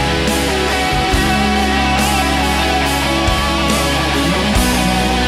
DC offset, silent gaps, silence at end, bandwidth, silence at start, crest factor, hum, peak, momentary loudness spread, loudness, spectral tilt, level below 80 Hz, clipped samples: under 0.1%; none; 0 s; 16 kHz; 0 s; 12 dB; none; -4 dBFS; 1 LU; -14 LUFS; -4 dB/octave; -22 dBFS; under 0.1%